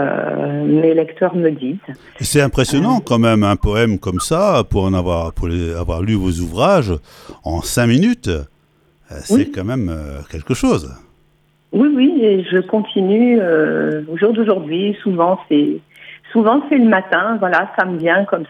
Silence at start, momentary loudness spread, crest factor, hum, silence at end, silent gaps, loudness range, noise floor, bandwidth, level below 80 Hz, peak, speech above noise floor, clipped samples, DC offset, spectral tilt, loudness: 0 s; 10 LU; 16 dB; none; 0.05 s; none; 4 LU; -56 dBFS; 15 kHz; -34 dBFS; 0 dBFS; 41 dB; under 0.1%; under 0.1%; -6 dB/octave; -16 LUFS